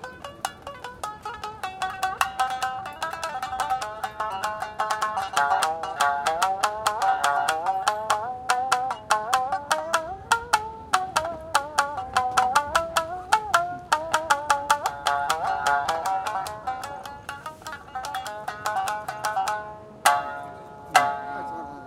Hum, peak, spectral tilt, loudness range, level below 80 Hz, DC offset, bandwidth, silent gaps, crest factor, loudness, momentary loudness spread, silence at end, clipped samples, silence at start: none; -2 dBFS; -1.5 dB/octave; 6 LU; -56 dBFS; under 0.1%; 17 kHz; none; 24 dB; -26 LUFS; 12 LU; 0 s; under 0.1%; 0 s